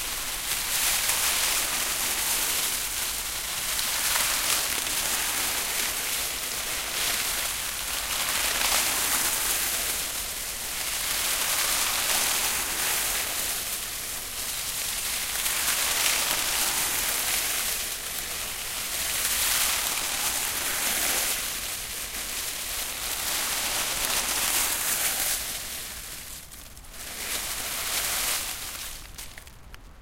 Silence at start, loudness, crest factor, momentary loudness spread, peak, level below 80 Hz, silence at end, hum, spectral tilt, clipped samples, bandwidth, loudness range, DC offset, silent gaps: 0 s; -25 LUFS; 24 dB; 8 LU; -4 dBFS; -48 dBFS; 0 s; none; 1 dB/octave; under 0.1%; 16.5 kHz; 3 LU; under 0.1%; none